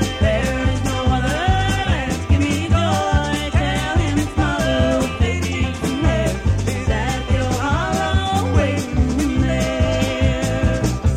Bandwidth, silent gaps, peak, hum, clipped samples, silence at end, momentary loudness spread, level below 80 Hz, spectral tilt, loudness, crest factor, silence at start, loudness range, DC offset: 15.5 kHz; none; -2 dBFS; none; under 0.1%; 0 s; 3 LU; -24 dBFS; -5.5 dB/octave; -19 LUFS; 16 dB; 0 s; 1 LU; under 0.1%